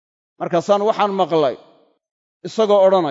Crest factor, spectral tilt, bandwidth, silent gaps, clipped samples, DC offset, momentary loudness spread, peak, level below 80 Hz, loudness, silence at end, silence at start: 16 dB; -6 dB/octave; 7.8 kHz; 2.11-2.40 s; under 0.1%; under 0.1%; 16 LU; -2 dBFS; -74 dBFS; -17 LUFS; 0 s; 0.4 s